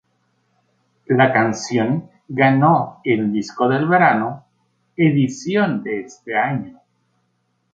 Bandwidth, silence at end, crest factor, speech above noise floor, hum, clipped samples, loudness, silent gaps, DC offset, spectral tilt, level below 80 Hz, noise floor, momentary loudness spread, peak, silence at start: 7.8 kHz; 1 s; 18 dB; 50 dB; none; under 0.1%; -18 LUFS; none; under 0.1%; -6.5 dB/octave; -62 dBFS; -68 dBFS; 13 LU; -2 dBFS; 1.1 s